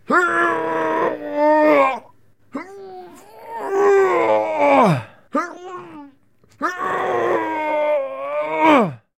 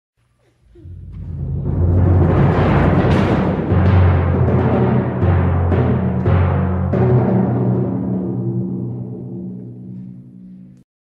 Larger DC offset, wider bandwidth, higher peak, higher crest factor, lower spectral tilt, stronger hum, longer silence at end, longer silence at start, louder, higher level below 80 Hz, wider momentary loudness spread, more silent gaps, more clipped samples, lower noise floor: first, 0.2% vs under 0.1%; first, 15 kHz vs 4.9 kHz; about the same, 0 dBFS vs -2 dBFS; about the same, 18 dB vs 14 dB; second, -6.5 dB/octave vs -10 dB/octave; neither; second, 0.2 s vs 0.4 s; second, 0.1 s vs 0.85 s; about the same, -18 LUFS vs -16 LUFS; second, -66 dBFS vs -30 dBFS; first, 20 LU vs 17 LU; neither; neither; about the same, -56 dBFS vs -59 dBFS